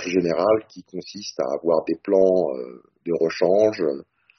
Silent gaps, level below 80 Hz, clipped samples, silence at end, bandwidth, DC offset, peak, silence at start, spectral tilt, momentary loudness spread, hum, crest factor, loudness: none; -64 dBFS; under 0.1%; 0.4 s; 6.4 kHz; under 0.1%; -6 dBFS; 0 s; -5 dB/octave; 17 LU; none; 16 dB; -21 LUFS